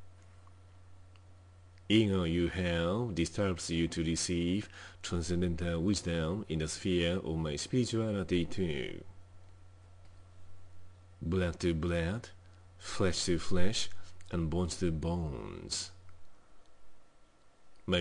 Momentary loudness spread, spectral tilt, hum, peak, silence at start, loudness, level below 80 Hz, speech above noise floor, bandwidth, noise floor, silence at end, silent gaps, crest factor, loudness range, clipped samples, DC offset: 11 LU; -5 dB/octave; none; -12 dBFS; 0 s; -34 LUFS; -52 dBFS; 27 dB; 10.5 kHz; -59 dBFS; 0 s; none; 20 dB; 6 LU; under 0.1%; under 0.1%